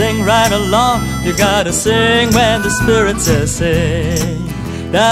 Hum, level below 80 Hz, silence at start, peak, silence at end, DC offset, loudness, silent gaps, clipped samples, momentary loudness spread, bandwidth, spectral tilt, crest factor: none; -28 dBFS; 0 s; 0 dBFS; 0 s; under 0.1%; -13 LUFS; none; under 0.1%; 6 LU; 16 kHz; -4 dB/octave; 12 dB